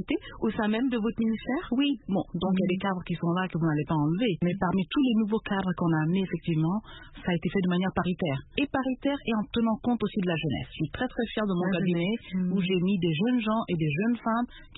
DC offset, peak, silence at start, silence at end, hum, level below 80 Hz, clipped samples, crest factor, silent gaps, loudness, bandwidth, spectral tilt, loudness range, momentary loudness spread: under 0.1%; -10 dBFS; 0 s; 0 s; none; -52 dBFS; under 0.1%; 16 dB; none; -28 LUFS; 4.1 kHz; -11 dB/octave; 2 LU; 5 LU